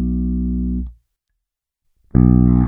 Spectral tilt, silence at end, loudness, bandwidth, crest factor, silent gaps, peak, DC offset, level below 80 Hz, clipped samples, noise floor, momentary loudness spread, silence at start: -14.5 dB/octave; 0 s; -17 LUFS; 2.3 kHz; 16 dB; none; 0 dBFS; under 0.1%; -24 dBFS; under 0.1%; -79 dBFS; 14 LU; 0 s